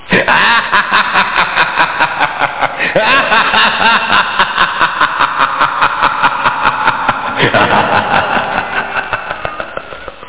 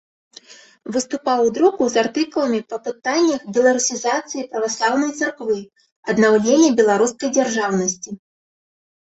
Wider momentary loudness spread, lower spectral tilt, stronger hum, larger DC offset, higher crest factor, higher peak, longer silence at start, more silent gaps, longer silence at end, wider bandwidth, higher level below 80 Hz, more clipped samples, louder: about the same, 9 LU vs 11 LU; first, -7 dB/octave vs -3.5 dB/octave; neither; first, 2% vs under 0.1%; about the same, 12 dB vs 16 dB; about the same, 0 dBFS vs -2 dBFS; second, 0 s vs 0.5 s; second, none vs 5.92-6.03 s; second, 0 s vs 1 s; second, 4 kHz vs 8.2 kHz; first, -42 dBFS vs -64 dBFS; neither; first, -11 LUFS vs -19 LUFS